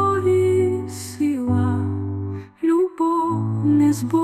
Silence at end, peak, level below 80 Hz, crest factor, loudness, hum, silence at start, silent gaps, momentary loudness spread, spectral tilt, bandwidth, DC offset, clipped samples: 0 s; -8 dBFS; -56 dBFS; 12 dB; -20 LUFS; none; 0 s; none; 10 LU; -8 dB/octave; 14 kHz; 0.1%; under 0.1%